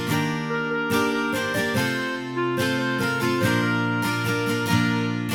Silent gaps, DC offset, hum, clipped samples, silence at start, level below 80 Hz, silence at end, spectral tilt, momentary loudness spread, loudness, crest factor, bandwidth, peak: none; under 0.1%; none; under 0.1%; 0 s; -58 dBFS; 0 s; -5 dB/octave; 4 LU; -23 LUFS; 16 dB; 18 kHz; -8 dBFS